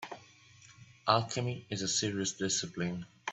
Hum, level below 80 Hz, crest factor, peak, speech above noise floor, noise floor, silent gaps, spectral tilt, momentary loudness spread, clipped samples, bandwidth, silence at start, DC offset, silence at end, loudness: none; -70 dBFS; 26 dB; -10 dBFS; 25 dB; -59 dBFS; none; -3.5 dB/octave; 10 LU; under 0.1%; 8.4 kHz; 0 s; under 0.1%; 0 s; -33 LUFS